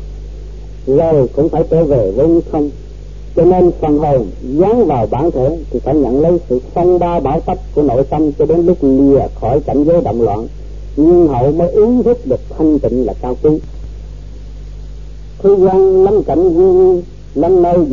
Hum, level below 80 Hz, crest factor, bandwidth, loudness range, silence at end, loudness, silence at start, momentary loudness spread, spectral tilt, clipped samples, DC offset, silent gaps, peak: 50 Hz at -25 dBFS; -28 dBFS; 12 dB; 7 kHz; 3 LU; 0 s; -12 LUFS; 0 s; 21 LU; -10.5 dB/octave; under 0.1%; 2%; none; 0 dBFS